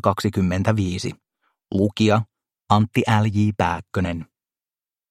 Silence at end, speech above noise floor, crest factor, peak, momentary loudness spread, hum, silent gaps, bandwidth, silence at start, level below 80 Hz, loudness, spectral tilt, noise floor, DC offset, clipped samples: 0.85 s; over 70 dB; 22 dB; 0 dBFS; 9 LU; none; none; 13.5 kHz; 0.05 s; -50 dBFS; -21 LUFS; -6.5 dB/octave; under -90 dBFS; under 0.1%; under 0.1%